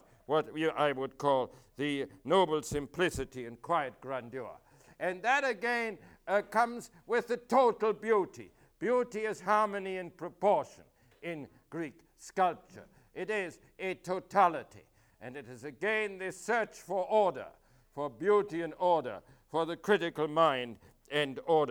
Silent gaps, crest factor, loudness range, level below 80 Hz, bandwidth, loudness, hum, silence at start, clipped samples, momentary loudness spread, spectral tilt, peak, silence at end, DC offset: none; 20 dB; 4 LU; -64 dBFS; 18.5 kHz; -32 LUFS; none; 0.3 s; under 0.1%; 16 LU; -5 dB/octave; -12 dBFS; 0 s; under 0.1%